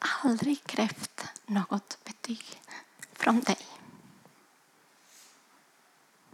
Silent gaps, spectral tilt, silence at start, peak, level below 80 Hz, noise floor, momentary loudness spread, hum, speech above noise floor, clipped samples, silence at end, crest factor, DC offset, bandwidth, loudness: none; -4 dB/octave; 0 s; -10 dBFS; -84 dBFS; -64 dBFS; 20 LU; none; 34 dB; under 0.1%; 2.4 s; 24 dB; under 0.1%; 15.5 kHz; -31 LUFS